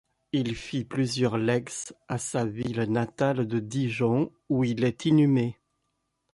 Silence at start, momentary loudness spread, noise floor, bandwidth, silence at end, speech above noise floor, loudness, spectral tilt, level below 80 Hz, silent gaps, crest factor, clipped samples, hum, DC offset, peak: 0.35 s; 9 LU; -78 dBFS; 11.5 kHz; 0.8 s; 51 dB; -27 LUFS; -6 dB/octave; -60 dBFS; none; 16 dB; under 0.1%; none; under 0.1%; -12 dBFS